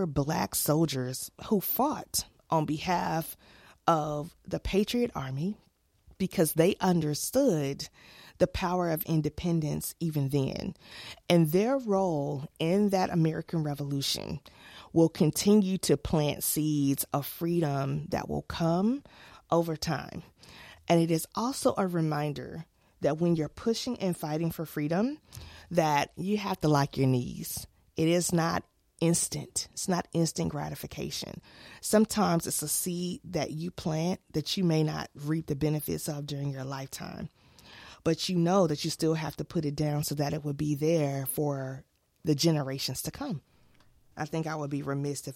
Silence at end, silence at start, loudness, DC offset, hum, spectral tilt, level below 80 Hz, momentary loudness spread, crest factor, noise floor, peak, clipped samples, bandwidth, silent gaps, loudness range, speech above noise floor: 0 s; 0 s; -30 LUFS; under 0.1%; none; -5.5 dB/octave; -54 dBFS; 12 LU; 20 dB; -61 dBFS; -10 dBFS; under 0.1%; 16.5 kHz; none; 4 LU; 32 dB